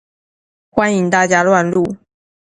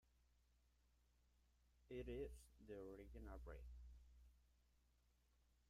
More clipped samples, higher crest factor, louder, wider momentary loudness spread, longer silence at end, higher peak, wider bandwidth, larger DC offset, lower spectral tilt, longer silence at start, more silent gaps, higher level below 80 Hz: neither; about the same, 16 dB vs 18 dB; first, -14 LUFS vs -58 LUFS; about the same, 10 LU vs 11 LU; first, 0.55 s vs 0 s; first, 0 dBFS vs -42 dBFS; second, 10.5 kHz vs 15 kHz; neither; second, -5.5 dB/octave vs -7 dB/octave; first, 0.75 s vs 0.05 s; neither; first, -52 dBFS vs -64 dBFS